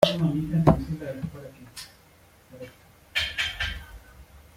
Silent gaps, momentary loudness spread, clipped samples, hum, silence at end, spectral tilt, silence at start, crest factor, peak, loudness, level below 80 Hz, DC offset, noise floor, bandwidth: none; 23 LU; under 0.1%; none; 0.15 s; -6 dB/octave; 0 s; 26 dB; -2 dBFS; -26 LUFS; -44 dBFS; under 0.1%; -56 dBFS; 16 kHz